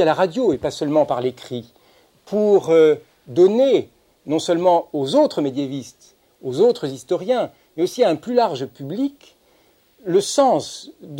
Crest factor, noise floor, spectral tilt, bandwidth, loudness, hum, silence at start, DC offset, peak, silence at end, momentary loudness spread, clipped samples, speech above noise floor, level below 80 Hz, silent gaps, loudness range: 16 dB; -57 dBFS; -5.5 dB/octave; 16.5 kHz; -19 LUFS; none; 0 s; under 0.1%; -4 dBFS; 0 s; 14 LU; under 0.1%; 39 dB; -62 dBFS; none; 4 LU